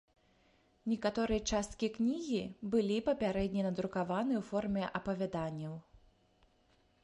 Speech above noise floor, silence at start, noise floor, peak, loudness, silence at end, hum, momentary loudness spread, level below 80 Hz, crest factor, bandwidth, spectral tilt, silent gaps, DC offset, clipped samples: 36 dB; 0.85 s; -71 dBFS; -20 dBFS; -36 LUFS; 1.05 s; none; 6 LU; -56 dBFS; 18 dB; 11.5 kHz; -5.5 dB/octave; none; under 0.1%; under 0.1%